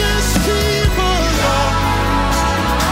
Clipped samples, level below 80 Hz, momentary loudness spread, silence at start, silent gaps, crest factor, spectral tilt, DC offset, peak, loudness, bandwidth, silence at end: under 0.1%; -20 dBFS; 1 LU; 0 s; none; 10 dB; -4 dB/octave; under 0.1%; -4 dBFS; -15 LUFS; 16.5 kHz; 0 s